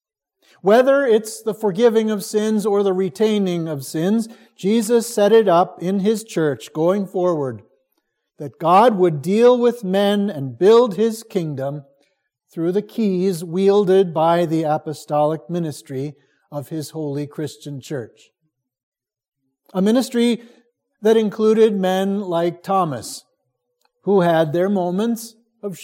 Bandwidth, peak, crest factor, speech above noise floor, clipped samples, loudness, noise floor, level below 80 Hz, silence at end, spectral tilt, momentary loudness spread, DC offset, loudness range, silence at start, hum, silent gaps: 17 kHz; -2 dBFS; 16 dB; 55 dB; under 0.1%; -18 LUFS; -72 dBFS; -72 dBFS; 0 s; -6 dB/octave; 15 LU; under 0.1%; 8 LU; 0.65 s; none; 18.83-18.92 s